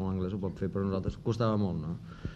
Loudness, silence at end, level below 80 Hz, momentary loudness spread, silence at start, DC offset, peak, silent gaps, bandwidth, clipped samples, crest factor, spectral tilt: -33 LUFS; 0 s; -50 dBFS; 8 LU; 0 s; under 0.1%; -16 dBFS; none; 8.2 kHz; under 0.1%; 16 dB; -8.5 dB/octave